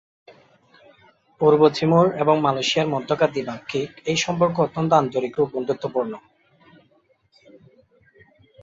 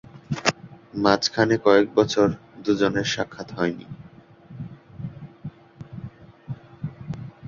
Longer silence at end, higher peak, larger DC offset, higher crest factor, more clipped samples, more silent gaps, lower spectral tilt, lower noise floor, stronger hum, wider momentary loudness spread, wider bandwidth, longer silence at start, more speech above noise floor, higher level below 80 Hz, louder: first, 2.45 s vs 0 s; about the same, -4 dBFS vs -2 dBFS; neither; about the same, 20 dB vs 22 dB; neither; neither; about the same, -5.5 dB/octave vs -5 dB/octave; first, -62 dBFS vs -48 dBFS; neither; second, 11 LU vs 22 LU; about the same, 7.8 kHz vs 7.6 kHz; first, 1.4 s vs 0.15 s; first, 42 dB vs 27 dB; second, -62 dBFS vs -54 dBFS; about the same, -21 LUFS vs -22 LUFS